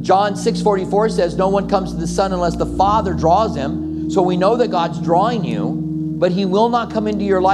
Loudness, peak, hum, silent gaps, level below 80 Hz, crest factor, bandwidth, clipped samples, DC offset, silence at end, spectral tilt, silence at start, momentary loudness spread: -17 LUFS; 0 dBFS; none; none; -36 dBFS; 16 dB; 11.5 kHz; under 0.1%; under 0.1%; 0 s; -6.5 dB/octave; 0 s; 6 LU